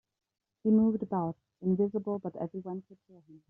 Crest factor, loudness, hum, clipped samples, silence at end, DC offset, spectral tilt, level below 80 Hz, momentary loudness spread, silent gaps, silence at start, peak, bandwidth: 16 dB; -31 LUFS; none; under 0.1%; 0.15 s; under 0.1%; -12.5 dB/octave; -70 dBFS; 14 LU; none; 0.65 s; -16 dBFS; 2 kHz